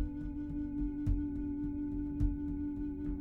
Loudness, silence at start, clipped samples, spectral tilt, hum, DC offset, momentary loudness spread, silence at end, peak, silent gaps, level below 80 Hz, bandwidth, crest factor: -38 LUFS; 0 s; under 0.1%; -11 dB/octave; none; under 0.1%; 4 LU; 0 s; -22 dBFS; none; -40 dBFS; 3.1 kHz; 14 dB